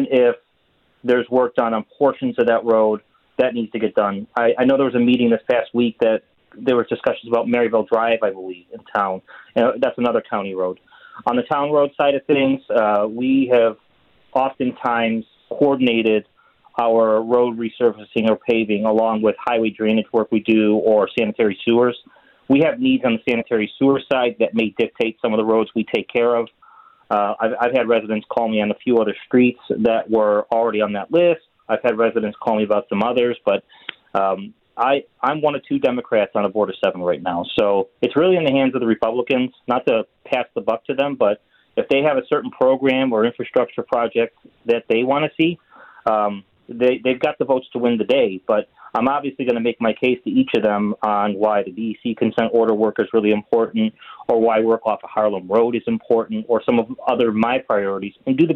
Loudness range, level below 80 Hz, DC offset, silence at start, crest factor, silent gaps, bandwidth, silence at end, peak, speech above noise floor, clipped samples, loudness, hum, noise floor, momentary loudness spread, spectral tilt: 2 LU; -62 dBFS; under 0.1%; 0 s; 14 dB; none; 5.2 kHz; 0 s; -4 dBFS; 44 dB; under 0.1%; -19 LUFS; none; -63 dBFS; 7 LU; -8 dB/octave